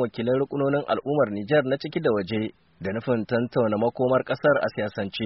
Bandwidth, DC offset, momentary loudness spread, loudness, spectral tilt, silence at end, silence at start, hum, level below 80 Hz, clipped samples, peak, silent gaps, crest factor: 5.8 kHz; under 0.1%; 7 LU; -25 LUFS; -5 dB/octave; 0 s; 0 s; none; -60 dBFS; under 0.1%; -8 dBFS; none; 16 dB